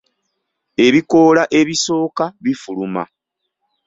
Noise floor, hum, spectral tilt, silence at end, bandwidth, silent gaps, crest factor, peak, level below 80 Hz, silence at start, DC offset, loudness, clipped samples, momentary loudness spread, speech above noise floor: -75 dBFS; none; -4.5 dB/octave; 0.85 s; 8 kHz; none; 16 dB; -2 dBFS; -56 dBFS; 0.8 s; under 0.1%; -15 LUFS; under 0.1%; 13 LU; 61 dB